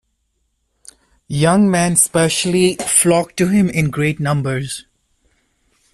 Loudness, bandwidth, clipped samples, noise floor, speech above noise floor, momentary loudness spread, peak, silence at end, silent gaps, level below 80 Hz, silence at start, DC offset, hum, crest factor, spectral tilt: -15 LUFS; 14 kHz; under 0.1%; -67 dBFS; 52 dB; 9 LU; 0 dBFS; 1.1 s; none; -48 dBFS; 1.3 s; under 0.1%; none; 18 dB; -4.5 dB/octave